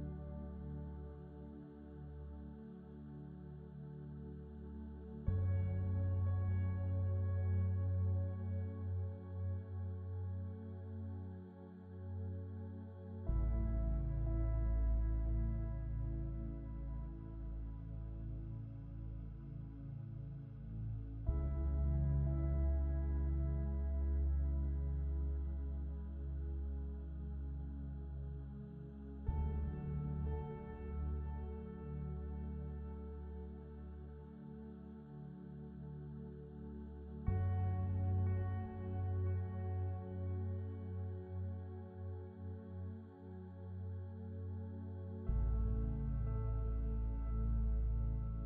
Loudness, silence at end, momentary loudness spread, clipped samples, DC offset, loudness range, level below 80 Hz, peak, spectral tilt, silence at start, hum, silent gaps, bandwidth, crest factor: -43 LUFS; 0 s; 14 LU; under 0.1%; under 0.1%; 11 LU; -44 dBFS; -24 dBFS; -11.5 dB/octave; 0 s; none; none; 2.8 kHz; 18 dB